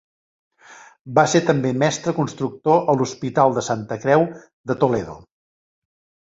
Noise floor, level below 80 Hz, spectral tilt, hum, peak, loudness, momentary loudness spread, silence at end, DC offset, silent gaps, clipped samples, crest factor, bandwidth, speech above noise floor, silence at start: -46 dBFS; -58 dBFS; -5.5 dB/octave; none; -2 dBFS; -20 LUFS; 9 LU; 1.1 s; under 0.1%; 0.99-1.04 s, 4.53-4.64 s; under 0.1%; 20 dB; 8 kHz; 27 dB; 0.7 s